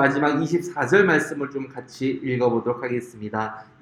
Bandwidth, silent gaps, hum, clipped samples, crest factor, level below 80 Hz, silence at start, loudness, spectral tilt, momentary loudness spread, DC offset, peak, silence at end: 13.5 kHz; none; none; under 0.1%; 20 dB; -64 dBFS; 0 s; -23 LUFS; -6 dB/octave; 12 LU; under 0.1%; -4 dBFS; 0.2 s